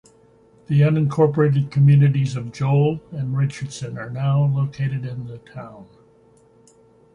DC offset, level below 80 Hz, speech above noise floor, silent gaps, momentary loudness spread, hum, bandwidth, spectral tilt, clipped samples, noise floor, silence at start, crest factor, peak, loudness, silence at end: under 0.1%; -56 dBFS; 34 dB; none; 17 LU; none; 9.8 kHz; -8.5 dB/octave; under 0.1%; -54 dBFS; 0.7 s; 16 dB; -4 dBFS; -20 LUFS; 1.3 s